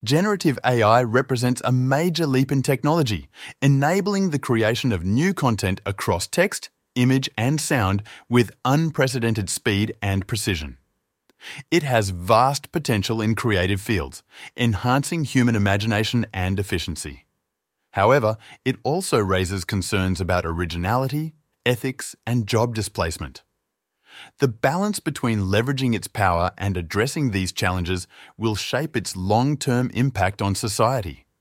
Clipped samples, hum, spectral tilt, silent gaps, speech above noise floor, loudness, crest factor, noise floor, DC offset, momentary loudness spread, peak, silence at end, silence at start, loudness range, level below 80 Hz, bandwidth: under 0.1%; none; -5.5 dB/octave; none; 57 dB; -22 LUFS; 20 dB; -78 dBFS; under 0.1%; 8 LU; -2 dBFS; 0.25 s; 0.05 s; 3 LU; -46 dBFS; 16.5 kHz